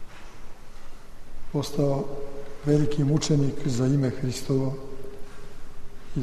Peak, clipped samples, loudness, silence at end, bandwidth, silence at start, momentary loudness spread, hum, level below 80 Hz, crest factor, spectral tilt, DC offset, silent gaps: -10 dBFS; under 0.1%; -26 LUFS; 0 s; 13.5 kHz; 0 s; 24 LU; none; -40 dBFS; 16 dB; -6.5 dB/octave; under 0.1%; none